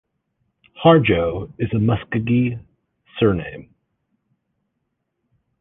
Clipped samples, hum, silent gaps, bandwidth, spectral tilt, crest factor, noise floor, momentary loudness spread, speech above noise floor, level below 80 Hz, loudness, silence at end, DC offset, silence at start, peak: under 0.1%; none; none; 3.9 kHz; -10.5 dB/octave; 20 dB; -75 dBFS; 20 LU; 57 dB; -44 dBFS; -19 LUFS; 2 s; under 0.1%; 0.75 s; -2 dBFS